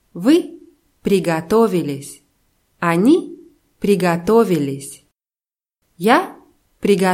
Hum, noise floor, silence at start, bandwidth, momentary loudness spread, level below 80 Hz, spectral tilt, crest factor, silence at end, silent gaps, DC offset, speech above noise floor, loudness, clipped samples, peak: none; under -90 dBFS; 0.15 s; 16.5 kHz; 16 LU; -54 dBFS; -6 dB/octave; 18 dB; 0 s; none; under 0.1%; over 74 dB; -17 LUFS; under 0.1%; 0 dBFS